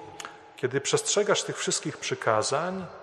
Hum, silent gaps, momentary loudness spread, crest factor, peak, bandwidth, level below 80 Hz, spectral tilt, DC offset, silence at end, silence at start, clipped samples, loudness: none; none; 13 LU; 20 dB; -8 dBFS; 13 kHz; -72 dBFS; -2.5 dB/octave; under 0.1%; 0 s; 0 s; under 0.1%; -27 LUFS